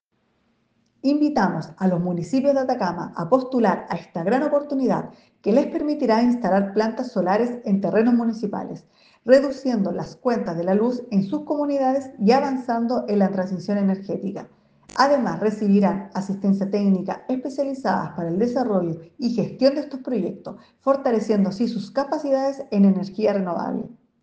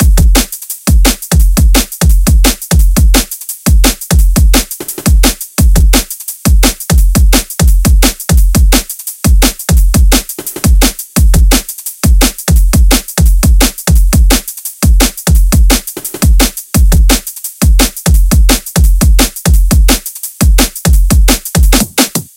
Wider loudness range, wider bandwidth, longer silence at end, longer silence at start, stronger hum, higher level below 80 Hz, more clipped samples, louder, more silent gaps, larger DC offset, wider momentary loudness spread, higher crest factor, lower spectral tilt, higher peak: about the same, 2 LU vs 1 LU; second, 8.2 kHz vs 17.5 kHz; first, 0.3 s vs 0.1 s; first, 1.05 s vs 0 s; neither; second, -64 dBFS vs -8 dBFS; second, under 0.1% vs 0.6%; second, -22 LUFS vs -10 LUFS; neither; neither; first, 9 LU vs 4 LU; first, 18 dB vs 8 dB; first, -7.5 dB/octave vs -4 dB/octave; about the same, -2 dBFS vs 0 dBFS